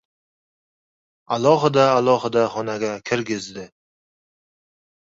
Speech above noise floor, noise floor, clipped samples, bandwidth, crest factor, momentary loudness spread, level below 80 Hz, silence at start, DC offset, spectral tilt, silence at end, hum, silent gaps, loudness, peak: over 71 dB; under -90 dBFS; under 0.1%; 8 kHz; 20 dB; 12 LU; -62 dBFS; 1.3 s; under 0.1%; -5.5 dB/octave; 1.5 s; none; none; -20 LUFS; -2 dBFS